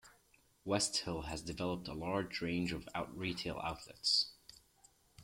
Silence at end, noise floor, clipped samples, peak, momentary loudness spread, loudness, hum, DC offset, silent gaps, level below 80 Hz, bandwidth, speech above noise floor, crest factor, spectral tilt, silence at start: 0 s; -71 dBFS; under 0.1%; -20 dBFS; 11 LU; -38 LUFS; none; under 0.1%; none; -60 dBFS; 16.5 kHz; 32 dB; 20 dB; -3.5 dB/octave; 0.05 s